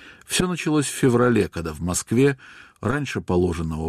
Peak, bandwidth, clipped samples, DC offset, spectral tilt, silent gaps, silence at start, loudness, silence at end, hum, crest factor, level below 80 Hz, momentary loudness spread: -8 dBFS; 14.5 kHz; under 0.1%; under 0.1%; -5 dB/octave; none; 0 s; -22 LUFS; 0 s; none; 14 dB; -44 dBFS; 8 LU